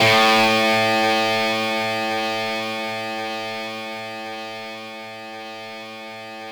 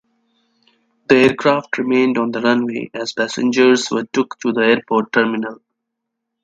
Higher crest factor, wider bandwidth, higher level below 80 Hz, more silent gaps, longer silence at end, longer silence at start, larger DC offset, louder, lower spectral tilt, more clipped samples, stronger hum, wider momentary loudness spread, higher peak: about the same, 16 dB vs 18 dB; first, over 20 kHz vs 9.2 kHz; about the same, -62 dBFS vs -60 dBFS; neither; second, 0 s vs 0.9 s; second, 0 s vs 1.1 s; neither; second, -20 LUFS vs -16 LUFS; second, -3 dB/octave vs -4.5 dB/octave; neither; neither; first, 18 LU vs 11 LU; second, -6 dBFS vs 0 dBFS